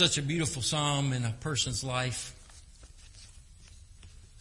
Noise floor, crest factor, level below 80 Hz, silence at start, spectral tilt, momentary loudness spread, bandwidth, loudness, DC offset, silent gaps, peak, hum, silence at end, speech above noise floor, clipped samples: -52 dBFS; 22 dB; -52 dBFS; 0 s; -3.5 dB/octave; 24 LU; 11.5 kHz; -30 LUFS; under 0.1%; none; -12 dBFS; none; 0 s; 22 dB; under 0.1%